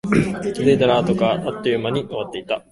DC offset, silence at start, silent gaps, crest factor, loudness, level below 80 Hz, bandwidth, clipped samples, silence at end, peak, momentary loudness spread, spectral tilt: under 0.1%; 0.05 s; none; 16 dB; -20 LUFS; -46 dBFS; 11.5 kHz; under 0.1%; 0.1 s; -2 dBFS; 10 LU; -6.5 dB/octave